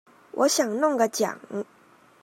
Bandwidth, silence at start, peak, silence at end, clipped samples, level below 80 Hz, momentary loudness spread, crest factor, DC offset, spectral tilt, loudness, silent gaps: 16 kHz; 0.35 s; -8 dBFS; 0.6 s; under 0.1%; -82 dBFS; 14 LU; 18 dB; under 0.1%; -2.5 dB/octave; -25 LUFS; none